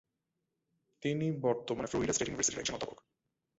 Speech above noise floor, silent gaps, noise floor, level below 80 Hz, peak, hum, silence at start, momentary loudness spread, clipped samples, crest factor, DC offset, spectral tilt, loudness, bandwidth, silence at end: 51 dB; none; -86 dBFS; -62 dBFS; -16 dBFS; none; 1 s; 7 LU; under 0.1%; 20 dB; under 0.1%; -4.5 dB/octave; -34 LUFS; 8 kHz; 0.65 s